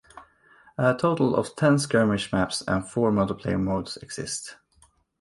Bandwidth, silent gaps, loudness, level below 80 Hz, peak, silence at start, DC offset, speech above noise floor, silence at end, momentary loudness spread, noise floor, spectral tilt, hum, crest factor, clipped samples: 11.5 kHz; none; -25 LUFS; -50 dBFS; -8 dBFS; 0.15 s; under 0.1%; 37 dB; 0.65 s; 11 LU; -62 dBFS; -5.5 dB/octave; none; 18 dB; under 0.1%